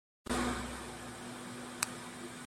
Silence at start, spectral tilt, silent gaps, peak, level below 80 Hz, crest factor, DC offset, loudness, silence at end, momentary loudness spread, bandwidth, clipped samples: 0.25 s; -3 dB/octave; none; -10 dBFS; -54 dBFS; 30 dB; under 0.1%; -40 LUFS; 0 s; 10 LU; 16 kHz; under 0.1%